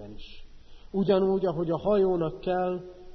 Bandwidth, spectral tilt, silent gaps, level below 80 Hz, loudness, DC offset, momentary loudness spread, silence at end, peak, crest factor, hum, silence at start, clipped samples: 6 kHz; -9.5 dB/octave; none; -48 dBFS; -27 LUFS; under 0.1%; 13 LU; 0 s; -12 dBFS; 16 dB; none; 0 s; under 0.1%